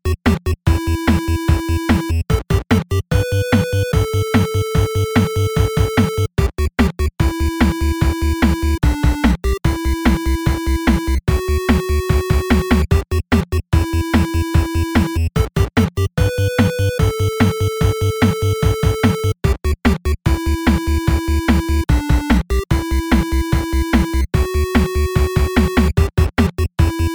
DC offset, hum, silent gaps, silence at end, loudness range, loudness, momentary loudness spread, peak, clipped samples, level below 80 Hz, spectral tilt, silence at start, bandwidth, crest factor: under 0.1%; none; none; 0 s; 1 LU; -17 LUFS; 2 LU; 0 dBFS; under 0.1%; -20 dBFS; -6.5 dB/octave; 0.05 s; over 20 kHz; 16 dB